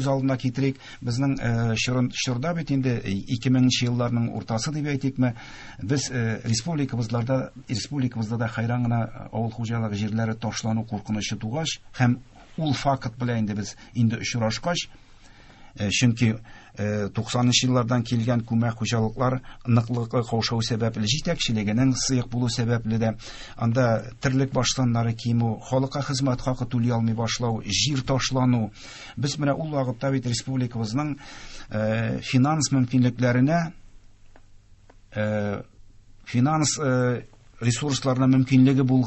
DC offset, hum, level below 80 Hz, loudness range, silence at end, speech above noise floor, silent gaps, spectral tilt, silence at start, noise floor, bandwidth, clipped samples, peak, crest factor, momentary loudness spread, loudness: under 0.1%; none; -48 dBFS; 3 LU; 0 s; 27 dB; none; -5.5 dB/octave; 0 s; -51 dBFS; 8.6 kHz; under 0.1%; -6 dBFS; 18 dB; 9 LU; -25 LUFS